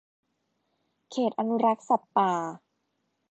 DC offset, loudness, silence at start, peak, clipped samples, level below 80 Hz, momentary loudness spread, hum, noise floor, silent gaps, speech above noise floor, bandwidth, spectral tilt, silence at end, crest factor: under 0.1%; -27 LUFS; 1.1 s; -10 dBFS; under 0.1%; -82 dBFS; 9 LU; none; -77 dBFS; none; 51 dB; 8.2 kHz; -6 dB/octave; 0.75 s; 20 dB